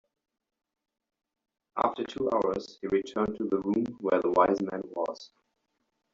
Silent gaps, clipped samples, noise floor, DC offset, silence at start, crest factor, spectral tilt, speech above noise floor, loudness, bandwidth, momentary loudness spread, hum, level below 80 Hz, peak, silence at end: none; under 0.1%; -79 dBFS; under 0.1%; 1.75 s; 22 dB; -5 dB/octave; 50 dB; -29 LUFS; 7.6 kHz; 10 LU; none; -64 dBFS; -10 dBFS; 0.9 s